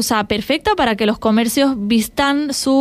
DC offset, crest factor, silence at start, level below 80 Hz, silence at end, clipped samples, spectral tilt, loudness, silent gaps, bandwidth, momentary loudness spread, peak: under 0.1%; 12 dB; 0 s; -42 dBFS; 0 s; under 0.1%; -3.5 dB/octave; -16 LUFS; none; 15.5 kHz; 2 LU; -4 dBFS